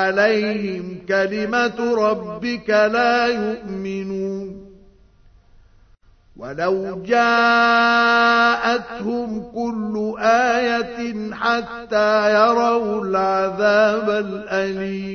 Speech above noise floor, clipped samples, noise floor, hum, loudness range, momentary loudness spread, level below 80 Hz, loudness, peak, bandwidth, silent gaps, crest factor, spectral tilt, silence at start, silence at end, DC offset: 33 dB; under 0.1%; -52 dBFS; none; 8 LU; 12 LU; -54 dBFS; -19 LUFS; -2 dBFS; 6.6 kHz; none; 16 dB; -5 dB/octave; 0 s; 0 s; under 0.1%